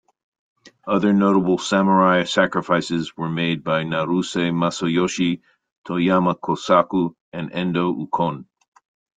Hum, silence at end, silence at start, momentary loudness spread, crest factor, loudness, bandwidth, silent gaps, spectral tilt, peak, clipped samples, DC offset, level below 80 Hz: none; 0.75 s; 0.65 s; 9 LU; 18 dB; -20 LUFS; 9.2 kHz; 5.72-5.84 s, 7.20-7.32 s; -6 dB/octave; -2 dBFS; under 0.1%; under 0.1%; -60 dBFS